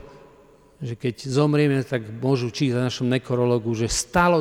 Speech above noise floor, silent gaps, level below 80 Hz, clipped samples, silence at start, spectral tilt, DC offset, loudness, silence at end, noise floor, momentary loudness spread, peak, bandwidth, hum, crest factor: 31 dB; none; -46 dBFS; under 0.1%; 0 s; -5.5 dB/octave; under 0.1%; -23 LUFS; 0 s; -52 dBFS; 9 LU; -6 dBFS; 16 kHz; none; 16 dB